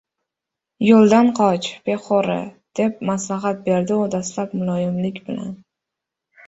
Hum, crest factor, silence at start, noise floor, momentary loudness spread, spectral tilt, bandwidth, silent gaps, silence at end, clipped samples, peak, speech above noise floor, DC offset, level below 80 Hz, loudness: none; 18 dB; 0.8 s; -85 dBFS; 14 LU; -6 dB/octave; 8 kHz; none; 0.95 s; under 0.1%; -2 dBFS; 66 dB; under 0.1%; -60 dBFS; -19 LUFS